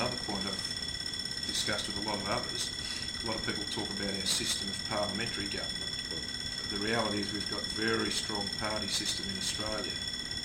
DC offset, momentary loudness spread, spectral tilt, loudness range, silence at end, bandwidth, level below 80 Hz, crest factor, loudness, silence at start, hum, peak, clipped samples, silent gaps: under 0.1%; 4 LU; -2.5 dB/octave; 1 LU; 0 s; 16 kHz; -54 dBFS; 18 dB; -32 LUFS; 0 s; none; -16 dBFS; under 0.1%; none